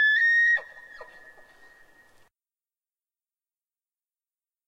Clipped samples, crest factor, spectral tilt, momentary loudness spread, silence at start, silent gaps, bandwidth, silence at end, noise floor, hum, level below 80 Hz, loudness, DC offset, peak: under 0.1%; 14 dB; 1 dB/octave; 27 LU; 0 s; none; 9.8 kHz; 3.65 s; under -90 dBFS; none; -72 dBFS; -20 LUFS; under 0.1%; -14 dBFS